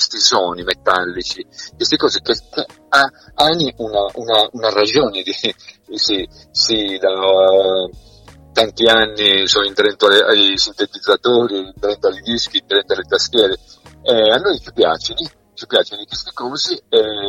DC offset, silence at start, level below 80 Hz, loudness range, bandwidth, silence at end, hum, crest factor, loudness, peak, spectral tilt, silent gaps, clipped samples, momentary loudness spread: under 0.1%; 0 s; -48 dBFS; 4 LU; 16 kHz; 0 s; none; 16 dB; -15 LUFS; 0 dBFS; -2.5 dB/octave; none; under 0.1%; 12 LU